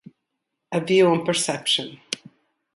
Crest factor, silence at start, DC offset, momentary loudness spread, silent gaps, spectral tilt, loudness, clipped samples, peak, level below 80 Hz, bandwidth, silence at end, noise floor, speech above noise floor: 18 dB; 0.7 s; under 0.1%; 15 LU; none; -3.5 dB/octave; -21 LUFS; under 0.1%; -6 dBFS; -68 dBFS; 11.5 kHz; 0.6 s; -80 dBFS; 59 dB